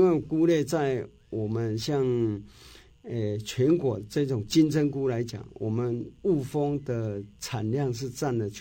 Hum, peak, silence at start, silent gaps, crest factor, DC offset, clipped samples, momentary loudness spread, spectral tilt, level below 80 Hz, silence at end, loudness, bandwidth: none; -10 dBFS; 0 s; none; 16 dB; under 0.1%; under 0.1%; 11 LU; -6.5 dB/octave; -56 dBFS; 0 s; -28 LUFS; 17 kHz